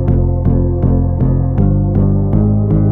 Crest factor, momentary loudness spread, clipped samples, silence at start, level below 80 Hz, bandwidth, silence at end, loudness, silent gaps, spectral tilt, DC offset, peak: 10 dB; 1 LU; under 0.1%; 0 s; -18 dBFS; 2.3 kHz; 0 s; -14 LUFS; none; -14 dB/octave; under 0.1%; -2 dBFS